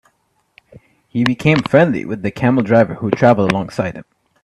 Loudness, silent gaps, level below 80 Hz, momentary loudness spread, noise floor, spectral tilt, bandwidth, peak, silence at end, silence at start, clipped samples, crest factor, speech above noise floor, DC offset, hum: -15 LUFS; none; -50 dBFS; 11 LU; -63 dBFS; -7.5 dB/octave; 12 kHz; 0 dBFS; 0.4 s; 1.15 s; under 0.1%; 16 dB; 49 dB; under 0.1%; none